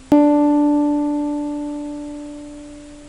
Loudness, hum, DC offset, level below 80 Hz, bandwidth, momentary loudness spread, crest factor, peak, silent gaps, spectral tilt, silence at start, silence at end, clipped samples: -18 LUFS; none; under 0.1%; -46 dBFS; 10 kHz; 21 LU; 16 dB; -2 dBFS; none; -7 dB/octave; 0 s; 0 s; under 0.1%